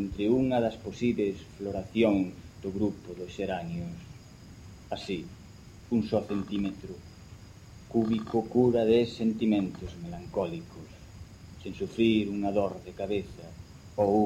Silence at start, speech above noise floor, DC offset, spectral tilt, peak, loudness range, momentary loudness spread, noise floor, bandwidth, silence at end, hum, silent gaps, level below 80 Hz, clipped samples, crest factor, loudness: 0 s; 20 dB; under 0.1%; -7.5 dB/octave; -12 dBFS; 7 LU; 23 LU; -49 dBFS; 11 kHz; 0 s; none; none; -54 dBFS; under 0.1%; 18 dB; -30 LUFS